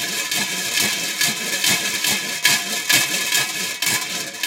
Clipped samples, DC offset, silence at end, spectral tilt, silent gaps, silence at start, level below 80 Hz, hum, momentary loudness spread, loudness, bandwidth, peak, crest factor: under 0.1%; under 0.1%; 0 s; 0 dB/octave; none; 0 s; -68 dBFS; none; 4 LU; -18 LUFS; 17 kHz; 0 dBFS; 22 dB